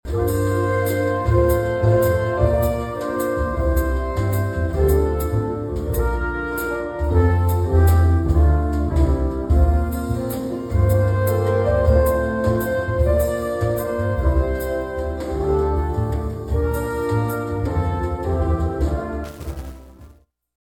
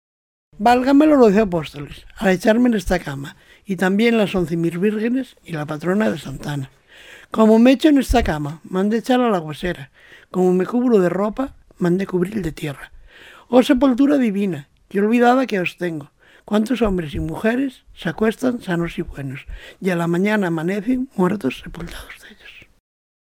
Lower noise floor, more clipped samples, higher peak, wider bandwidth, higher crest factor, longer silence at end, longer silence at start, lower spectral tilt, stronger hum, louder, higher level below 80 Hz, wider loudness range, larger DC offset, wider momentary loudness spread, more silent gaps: first, -50 dBFS vs -44 dBFS; neither; second, -4 dBFS vs 0 dBFS; about the same, 18 kHz vs 16.5 kHz; about the same, 16 dB vs 18 dB; second, 0.55 s vs 0.7 s; second, 0.05 s vs 0.6 s; first, -8 dB/octave vs -6.5 dB/octave; neither; about the same, -20 LUFS vs -19 LUFS; first, -24 dBFS vs -38 dBFS; about the same, 4 LU vs 5 LU; neither; second, 8 LU vs 16 LU; neither